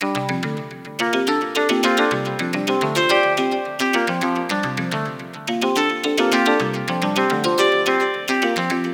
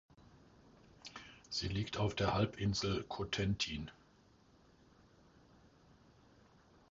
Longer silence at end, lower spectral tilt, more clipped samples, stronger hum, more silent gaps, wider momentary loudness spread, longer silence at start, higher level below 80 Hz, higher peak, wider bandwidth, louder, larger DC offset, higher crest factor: second, 0 s vs 3 s; about the same, -4 dB/octave vs -4.5 dB/octave; neither; neither; neither; second, 8 LU vs 17 LU; second, 0 s vs 0.2 s; second, -66 dBFS vs -56 dBFS; first, 0 dBFS vs -20 dBFS; first, 18 kHz vs 7.6 kHz; first, -20 LUFS vs -38 LUFS; neither; about the same, 20 dB vs 22 dB